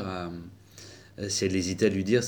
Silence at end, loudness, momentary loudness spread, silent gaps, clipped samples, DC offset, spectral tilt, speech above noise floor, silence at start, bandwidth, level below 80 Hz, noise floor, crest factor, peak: 0 s; -28 LUFS; 22 LU; none; under 0.1%; under 0.1%; -4.5 dB/octave; 23 dB; 0 s; over 20 kHz; -62 dBFS; -49 dBFS; 18 dB; -10 dBFS